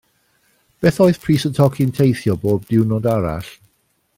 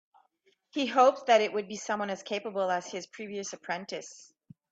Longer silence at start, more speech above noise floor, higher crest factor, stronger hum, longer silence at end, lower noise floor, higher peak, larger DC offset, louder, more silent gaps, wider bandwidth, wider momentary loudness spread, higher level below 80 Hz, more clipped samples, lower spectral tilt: about the same, 0.8 s vs 0.75 s; first, 48 dB vs 42 dB; about the same, 16 dB vs 20 dB; neither; first, 0.65 s vs 0.5 s; second, -64 dBFS vs -71 dBFS; first, -2 dBFS vs -10 dBFS; neither; first, -17 LUFS vs -30 LUFS; neither; first, 16.5 kHz vs 8 kHz; second, 7 LU vs 16 LU; first, -46 dBFS vs -80 dBFS; neither; first, -7.5 dB/octave vs -3 dB/octave